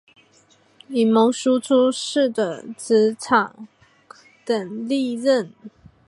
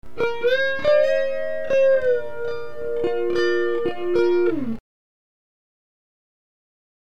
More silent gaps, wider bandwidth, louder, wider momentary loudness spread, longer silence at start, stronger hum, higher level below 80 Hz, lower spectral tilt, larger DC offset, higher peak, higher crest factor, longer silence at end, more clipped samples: neither; first, 11.5 kHz vs 8 kHz; about the same, -20 LUFS vs -22 LUFS; about the same, 10 LU vs 12 LU; first, 0.9 s vs 0 s; neither; second, -68 dBFS vs -56 dBFS; about the same, -4.5 dB/octave vs -5.5 dB/octave; second, under 0.1% vs 4%; first, -2 dBFS vs -8 dBFS; about the same, 18 dB vs 14 dB; second, 0.4 s vs 2.25 s; neither